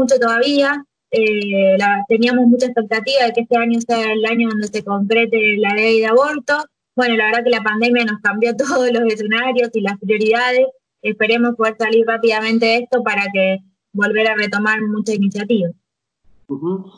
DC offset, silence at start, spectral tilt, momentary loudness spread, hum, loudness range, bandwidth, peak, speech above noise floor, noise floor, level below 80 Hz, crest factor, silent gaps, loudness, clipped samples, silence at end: under 0.1%; 0 s; -5 dB/octave; 7 LU; none; 2 LU; 10.5 kHz; -2 dBFS; 40 dB; -56 dBFS; -66 dBFS; 14 dB; none; -16 LUFS; under 0.1%; 0.1 s